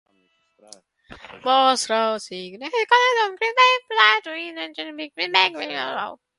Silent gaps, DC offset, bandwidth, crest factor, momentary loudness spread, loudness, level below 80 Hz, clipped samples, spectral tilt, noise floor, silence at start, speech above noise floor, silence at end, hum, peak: none; under 0.1%; 11.5 kHz; 22 dB; 15 LU; -20 LUFS; -68 dBFS; under 0.1%; -1 dB/octave; -66 dBFS; 1.1 s; 45 dB; 0.25 s; none; 0 dBFS